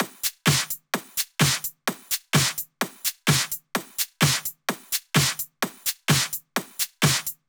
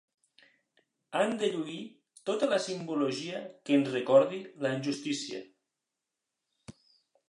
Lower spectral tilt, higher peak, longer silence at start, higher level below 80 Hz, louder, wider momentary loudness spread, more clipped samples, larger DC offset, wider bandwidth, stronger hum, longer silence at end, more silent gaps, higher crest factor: second, -3 dB/octave vs -5 dB/octave; first, -6 dBFS vs -10 dBFS; second, 0 s vs 1.1 s; first, -58 dBFS vs -80 dBFS; first, -24 LUFS vs -31 LUFS; second, 8 LU vs 16 LU; neither; neither; first, over 20 kHz vs 11 kHz; neither; second, 0.15 s vs 0.6 s; neither; about the same, 20 dB vs 22 dB